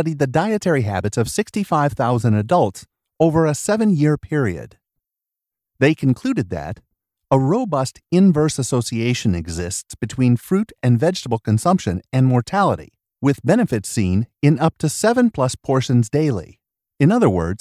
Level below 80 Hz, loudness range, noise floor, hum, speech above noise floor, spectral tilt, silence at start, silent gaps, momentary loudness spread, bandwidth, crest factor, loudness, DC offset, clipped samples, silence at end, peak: -42 dBFS; 3 LU; -85 dBFS; none; 67 dB; -6.5 dB/octave; 0 s; none; 7 LU; 15 kHz; 16 dB; -19 LUFS; under 0.1%; under 0.1%; 0.05 s; -2 dBFS